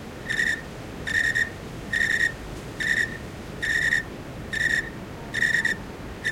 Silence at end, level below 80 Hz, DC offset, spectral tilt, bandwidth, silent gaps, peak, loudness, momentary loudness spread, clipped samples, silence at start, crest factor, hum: 0 s; -46 dBFS; under 0.1%; -3 dB/octave; 16.5 kHz; none; -10 dBFS; -24 LUFS; 15 LU; under 0.1%; 0 s; 18 dB; none